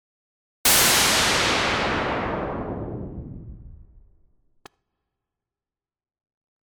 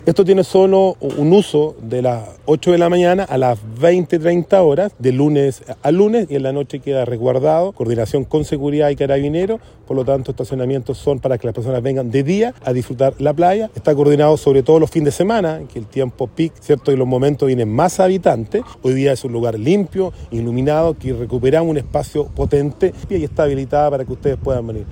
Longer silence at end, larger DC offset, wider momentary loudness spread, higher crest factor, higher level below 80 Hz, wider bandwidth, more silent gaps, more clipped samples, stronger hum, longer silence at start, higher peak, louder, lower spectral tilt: first, 2.85 s vs 0 s; neither; first, 21 LU vs 9 LU; about the same, 18 dB vs 14 dB; about the same, -44 dBFS vs -40 dBFS; first, 19.5 kHz vs 16.5 kHz; neither; neither; neither; first, 0.65 s vs 0.05 s; second, -8 dBFS vs 0 dBFS; second, -20 LUFS vs -16 LUFS; second, -1.5 dB/octave vs -7.5 dB/octave